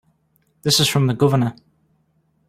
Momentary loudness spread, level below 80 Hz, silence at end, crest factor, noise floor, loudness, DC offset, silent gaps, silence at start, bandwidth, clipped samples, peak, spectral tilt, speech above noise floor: 10 LU; -56 dBFS; 0.95 s; 18 dB; -64 dBFS; -18 LUFS; under 0.1%; none; 0.65 s; 16 kHz; under 0.1%; -2 dBFS; -4.5 dB/octave; 46 dB